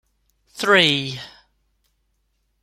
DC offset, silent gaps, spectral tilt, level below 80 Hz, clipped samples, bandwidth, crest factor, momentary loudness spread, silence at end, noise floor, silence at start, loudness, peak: under 0.1%; none; -3.5 dB/octave; -62 dBFS; under 0.1%; 16 kHz; 22 dB; 21 LU; 1.35 s; -69 dBFS; 0.55 s; -17 LUFS; 0 dBFS